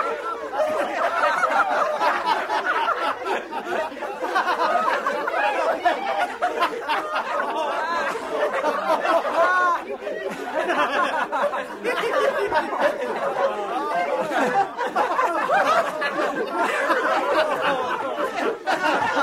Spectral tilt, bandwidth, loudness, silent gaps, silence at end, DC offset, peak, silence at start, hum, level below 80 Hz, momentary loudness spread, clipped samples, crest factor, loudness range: -3 dB/octave; 16 kHz; -23 LUFS; none; 0 s; under 0.1%; -8 dBFS; 0 s; none; -64 dBFS; 6 LU; under 0.1%; 16 dB; 2 LU